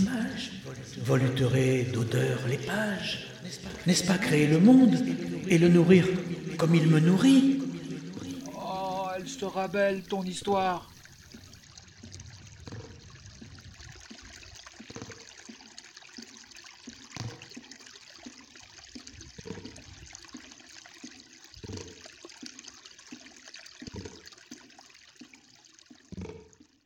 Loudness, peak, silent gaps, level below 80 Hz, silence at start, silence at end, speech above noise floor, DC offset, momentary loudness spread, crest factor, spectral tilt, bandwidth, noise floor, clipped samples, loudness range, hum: -26 LUFS; -8 dBFS; none; -60 dBFS; 0 s; 0.45 s; 33 dB; under 0.1%; 26 LU; 22 dB; -6 dB/octave; 16 kHz; -57 dBFS; under 0.1%; 24 LU; none